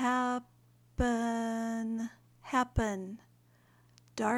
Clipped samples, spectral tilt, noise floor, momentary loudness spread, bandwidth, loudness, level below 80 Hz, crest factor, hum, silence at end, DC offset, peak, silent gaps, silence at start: under 0.1%; -5.5 dB/octave; -65 dBFS; 16 LU; 12.5 kHz; -34 LUFS; -48 dBFS; 18 dB; 60 Hz at -60 dBFS; 0 s; under 0.1%; -16 dBFS; none; 0 s